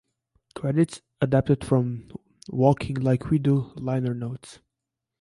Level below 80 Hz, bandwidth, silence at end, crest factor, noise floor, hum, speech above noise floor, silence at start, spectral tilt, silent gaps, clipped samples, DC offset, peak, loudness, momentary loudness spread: -52 dBFS; 11.5 kHz; 0.65 s; 18 dB; -85 dBFS; none; 61 dB; 0.55 s; -8.5 dB/octave; none; under 0.1%; under 0.1%; -6 dBFS; -25 LUFS; 15 LU